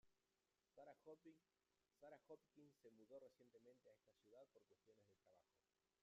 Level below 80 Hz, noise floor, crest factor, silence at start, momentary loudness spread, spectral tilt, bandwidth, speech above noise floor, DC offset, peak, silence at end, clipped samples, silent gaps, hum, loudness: under -90 dBFS; under -90 dBFS; 18 dB; 0.05 s; 3 LU; -5 dB/octave; 7.2 kHz; over 20 dB; under 0.1%; -52 dBFS; 0 s; under 0.1%; none; none; -67 LUFS